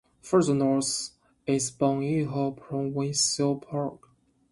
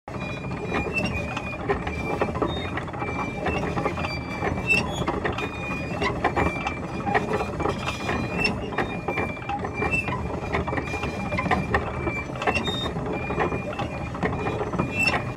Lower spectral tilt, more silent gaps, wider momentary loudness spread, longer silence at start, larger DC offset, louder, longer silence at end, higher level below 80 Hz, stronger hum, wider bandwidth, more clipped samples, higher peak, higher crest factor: second, -4.5 dB/octave vs -6 dB/octave; neither; first, 9 LU vs 6 LU; first, 0.25 s vs 0.05 s; neither; about the same, -27 LUFS vs -26 LUFS; first, 0.55 s vs 0 s; second, -64 dBFS vs -40 dBFS; neither; second, 11.5 kHz vs 16 kHz; neither; about the same, -10 dBFS vs -8 dBFS; about the same, 18 dB vs 20 dB